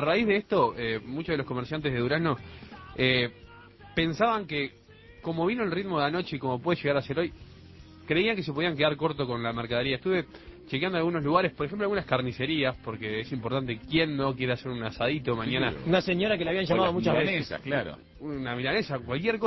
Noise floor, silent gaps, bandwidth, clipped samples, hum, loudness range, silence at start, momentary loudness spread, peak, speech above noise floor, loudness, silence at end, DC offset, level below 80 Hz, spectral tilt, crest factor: -50 dBFS; none; 6 kHz; under 0.1%; none; 3 LU; 0 s; 9 LU; -8 dBFS; 22 dB; -28 LUFS; 0 s; under 0.1%; -54 dBFS; -7.5 dB/octave; 20 dB